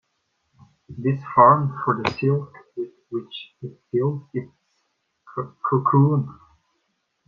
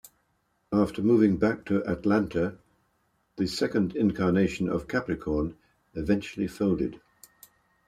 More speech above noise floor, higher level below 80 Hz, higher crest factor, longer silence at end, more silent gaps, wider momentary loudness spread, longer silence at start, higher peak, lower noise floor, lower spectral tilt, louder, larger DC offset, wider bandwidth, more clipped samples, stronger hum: first, 52 dB vs 47 dB; second, -62 dBFS vs -52 dBFS; about the same, 22 dB vs 18 dB; about the same, 0.95 s vs 0.9 s; neither; first, 20 LU vs 9 LU; first, 0.9 s vs 0.7 s; first, -2 dBFS vs -10 dBFS; about the same, -73 dBFS vs -72 dBFS; first, -9 dB/octave vs -7 dB/octave; first, -21 LUFS vs -27 LUFS; neither; second, 6.2 kHz vs 14.5 kHz; neither; neither